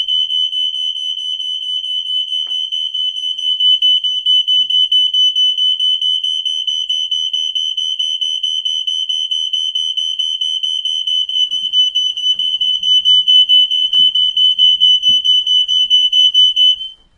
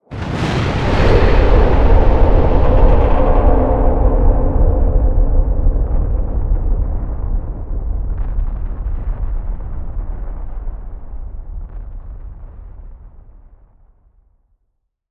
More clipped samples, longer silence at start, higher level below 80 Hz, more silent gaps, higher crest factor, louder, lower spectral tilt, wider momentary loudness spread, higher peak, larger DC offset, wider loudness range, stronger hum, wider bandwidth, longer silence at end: neither; about the same, 0 s vs 0 s; second, -60 dBFS vs -16 dBFS; neither; about the same, 12 dB vs 14 dB; first, -11 LUFS vs -17 LUFS; second, 3 dB/octave vs -8.5 dB/octave; second, 8 LU vs 20 LU; about the same, -2 dBFS vs 0 dBFS; neither; second, 7 LU vs 20 LU; neither; first, 10 kHz vs 6.2 kHz; first, 0.25 s vs 0 s